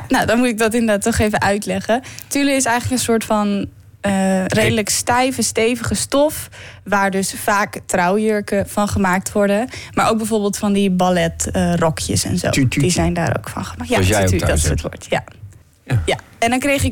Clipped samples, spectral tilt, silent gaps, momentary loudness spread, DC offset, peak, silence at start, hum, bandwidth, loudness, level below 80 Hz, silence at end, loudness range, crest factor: under 0.1%; -4.5 dB/octave; none; 7 LU; under 0.1%; -6 dBFS; 0 s; none; 18 kHz; -17 LUFS; -36 dBFS; 0 s; 1 LU; 10 dB